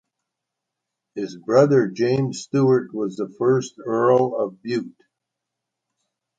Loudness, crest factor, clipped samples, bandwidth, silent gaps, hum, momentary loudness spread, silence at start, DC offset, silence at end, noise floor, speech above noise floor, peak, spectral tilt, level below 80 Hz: -21 LUFS; 18 dB; under 0.1%; 9 kHz; none; none; 13 LU; 1.15 s; under 0.1%; 1.5 s; -83 dBFS; 63 dB; -4 dBFS; -7 dB/octave; -66 dBFS